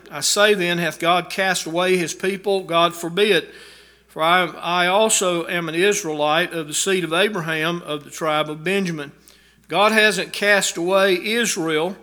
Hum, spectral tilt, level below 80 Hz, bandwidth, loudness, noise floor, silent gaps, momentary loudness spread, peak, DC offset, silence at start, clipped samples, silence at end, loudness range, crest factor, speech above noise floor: none; -3 dB/octave; -64 dBFS; over 20 kHz; -19 LUFS; -51 dBFS; none; 7 LU; 0 dBFS; under 0.1%; 0.05 s; under 0.1%; 0.05 s; 2 LU; 20 dB; 32 dB